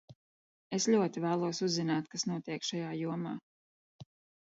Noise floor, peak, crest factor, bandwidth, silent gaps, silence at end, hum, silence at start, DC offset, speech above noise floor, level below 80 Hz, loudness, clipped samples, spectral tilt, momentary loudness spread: under -90 dBFS; -16 dBFS; 18 dB; 8 kHz; 0.15-0.70 s, 3.43-3.99 s; 0.4 s; none; 0.1 s; under 0.1%; over 57 dB; -80 dBFS; -34 LUFS; under 0.1%; -4.5 dB/octave; 10 LU